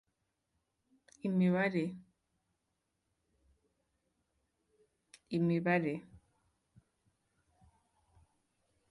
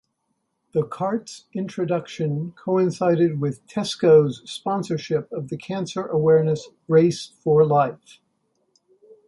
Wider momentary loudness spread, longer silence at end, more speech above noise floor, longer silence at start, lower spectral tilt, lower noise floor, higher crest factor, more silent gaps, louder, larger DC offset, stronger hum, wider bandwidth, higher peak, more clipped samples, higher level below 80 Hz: about the same, 12 LU vs 12 LU; first, 2.75 s vs 1.3 s; about the same, 52 dB vs 53 dB; first, 1.25 s vs 0.75 s; first, -8.5 dB/octave vs -7 dB/octave; first, -84 dBFS vs -74 dBFS; about the same, 22 dB vs 18 dB; neither; second, -34 LUFS vs -22 LUFS; neither; neither; about the same, 11 kHz vs 11.5 kHz; second, -16 dBFS vs -4 dBFS; neither; second, -76 dBFS vs -66 dBFS